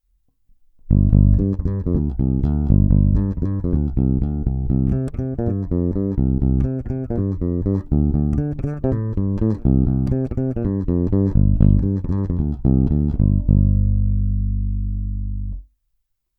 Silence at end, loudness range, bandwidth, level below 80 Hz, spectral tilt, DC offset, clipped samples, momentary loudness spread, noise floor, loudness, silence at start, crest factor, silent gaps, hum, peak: 0.75 s; 3 LU; 2 kHz; -24 dBFS; -13 dB/octave; under 0.1%; under 0.1%; 8 LU; -71 dBFS; -20 LUFS; 0.85 s; 18 dB; none; none; 0 dBFS